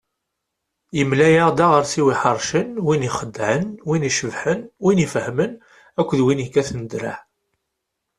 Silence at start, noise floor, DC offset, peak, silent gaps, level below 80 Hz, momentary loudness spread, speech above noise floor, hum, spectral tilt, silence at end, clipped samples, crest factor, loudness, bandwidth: 0.95 s; -79 dBFS; under 0.1%; -2 dBFS; none; -54 dBFS; 12 LU; 60 dB; none; -5.5 dB/octave; 1 s; under 0.1%; 18 dB; -19 LUFS; 12.5 kHz